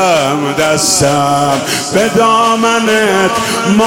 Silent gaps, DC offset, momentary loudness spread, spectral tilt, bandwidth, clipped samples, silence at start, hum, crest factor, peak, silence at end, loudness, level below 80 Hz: none; under 0.1%; 4 LU; -3.5 dB/octave; 17 kHz; under 0.1%; 0 s; none; 10 dB; 0 dBFS; 0 s; -11 LUFS; -44 dBFS